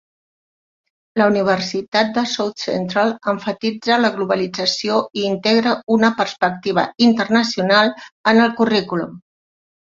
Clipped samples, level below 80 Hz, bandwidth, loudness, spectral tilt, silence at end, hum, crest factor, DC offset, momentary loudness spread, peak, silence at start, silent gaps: under 0.1%; -60 dBFS; 7.6 kHz; -18 LUFS; -4.5 dB/octave; 0.7 s; none; 16 dB; under 0.1%; 7 LU; -2 dBFS; 1.15 s; 1.88-1.92 s, 8.12-8.24 s